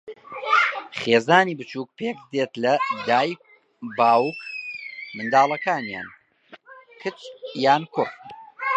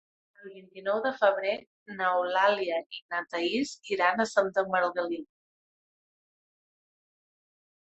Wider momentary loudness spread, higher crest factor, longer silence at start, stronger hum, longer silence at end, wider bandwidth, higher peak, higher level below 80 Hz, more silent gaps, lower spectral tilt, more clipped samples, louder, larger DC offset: first, 16 LU vs 12 LU; about the same, 22 dB vs 22 dB; second, 0.05 s vs 0.4 s; neither; second, 0 s vs 2.7 s; about the same, 8.8 kHz vs 8.4 kHz; first, 0 dBFS vs -10 dBFS; about the same, -74 dBFS vs -76 dBFS; second, none vs 1.67-1.86 s, 2.86-2.90 s, 3.02-3.09 s; first, -5 dB/octave vs -3.5 dB/octave; neither; first, -22 LUFS vs -28 LUFS; neither